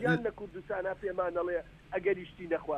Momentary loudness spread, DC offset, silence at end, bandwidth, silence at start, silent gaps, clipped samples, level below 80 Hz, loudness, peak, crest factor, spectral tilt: 6 LU; under 0.1%; 0 s; 10 kHz; 0 s; none; under 0.1%; -58 dBFS; -35 LUFS; -16 dBFS; 18 dB; -8 dB/octave